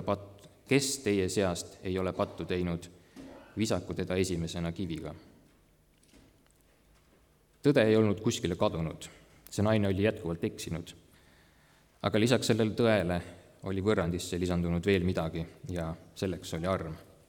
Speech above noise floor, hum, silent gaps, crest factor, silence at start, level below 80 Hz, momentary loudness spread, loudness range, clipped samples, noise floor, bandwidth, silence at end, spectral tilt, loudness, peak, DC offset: 34 dB; none; none; 22 dB; 0 s; -56 dBFS; 15 LU; 6 LU; under 0.1%; -65 dBFS; 19 kHz; 0.25 s; -5.5 dB/octave; -31 LUFS; -10 dBFS; under 0.1%